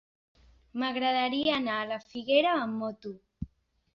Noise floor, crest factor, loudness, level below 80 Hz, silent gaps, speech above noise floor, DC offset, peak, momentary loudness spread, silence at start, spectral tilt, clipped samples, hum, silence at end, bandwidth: -60 dBFS; 20 dB; -29 LUFS; -60 dBFS; none; 31 dB; under 0.1%; -12 dBFS; 19 LU; 0.75 s; -6 dB/octave; under 0.1%; none; 0.5 s; 7 kHz